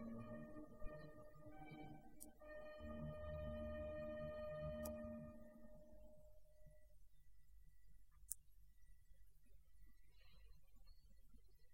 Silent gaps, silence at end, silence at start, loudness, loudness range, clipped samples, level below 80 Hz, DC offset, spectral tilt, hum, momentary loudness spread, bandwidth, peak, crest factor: none; 0 s; 0 s; -54 LUFS; 10 LU; under 0.1%; -64 dBFS; under 0.1%; -6 dB/octave; none; 13 LU; 16 kHz; -22 dBFS; 34 dB